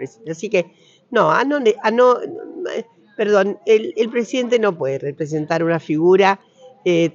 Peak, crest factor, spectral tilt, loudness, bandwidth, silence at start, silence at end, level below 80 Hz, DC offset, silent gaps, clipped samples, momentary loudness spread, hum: -4 dBFS; 14 dB; -6 dB/octave; -18 LUFS; 7.6 kHz; 0 s; 0.05 s; -74 dBFS; under 0.1%; none; under 0.1%; 13 LU; none